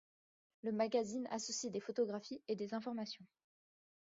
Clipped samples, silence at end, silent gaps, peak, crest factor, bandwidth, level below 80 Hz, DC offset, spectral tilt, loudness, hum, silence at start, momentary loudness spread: under 0.1%; 0.9 s; none; -24 dBFS; 20 dB; 7.6 kHz; -86 dBFS; under 0.1%; -4 dB/octave; -41 LUFS; none; 0.65 s; 10 LU